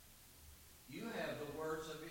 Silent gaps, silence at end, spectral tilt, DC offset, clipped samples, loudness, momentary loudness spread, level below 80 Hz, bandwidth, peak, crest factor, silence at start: none; 0 s; -4.5 dB/octave; under 0.1%; under 0.1%; -46 LUFS; 15 LU; -68 dBFS; 17 kHz; -32 dBFS; 16 dB; 0 s